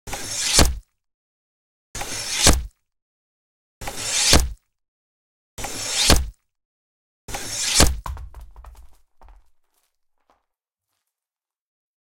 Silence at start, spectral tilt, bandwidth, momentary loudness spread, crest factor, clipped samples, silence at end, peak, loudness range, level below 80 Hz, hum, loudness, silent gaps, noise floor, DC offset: 0.05 s; -2 dB/octave; 17 kHz; 20 LU; 24 dB; under 0.1%; 3.2 s; 0 dBFS; 3 LU; -32 dBFS; none; -19 LUFS; 1.14-1.94 s, 3.02-3.81 s, 4.88-5.57 s, 6.65-7.28 s; under -90 dBFS; under 0.1%